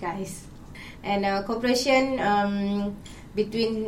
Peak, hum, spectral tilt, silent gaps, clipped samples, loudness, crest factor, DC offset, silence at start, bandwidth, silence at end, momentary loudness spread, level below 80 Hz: -8 dBFS; none; -5 dB/octave; none; under 0.1%; -25 LUFS; 18 dB; under 0.1%; 0 s; 16 kHz; 0 s; 20 LU; -48 dBFS